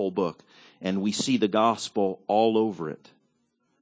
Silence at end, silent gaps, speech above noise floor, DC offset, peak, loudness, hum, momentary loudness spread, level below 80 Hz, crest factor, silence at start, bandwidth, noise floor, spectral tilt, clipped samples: 0.85 s; none; 46 dB; under 0.1%; -10 dBFS; -26 LUFS; none; 13 LU; -68 dBFS; 18 dB; 0 s; 8 kHz; -72 dBFS; -5 dB/octave; under 0.1%